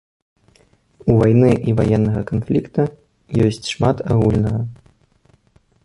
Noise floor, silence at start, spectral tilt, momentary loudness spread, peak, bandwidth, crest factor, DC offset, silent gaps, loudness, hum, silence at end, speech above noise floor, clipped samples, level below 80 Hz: -56 dBFS; 1.05 s; -8 dB/octave; 10 LU; -2 dBFS; 11 kHz; 16 dB; under 0.1%; none; -18 LUFS; none; 1.1 s; 40 dB; under 0.1%; -38 dBFS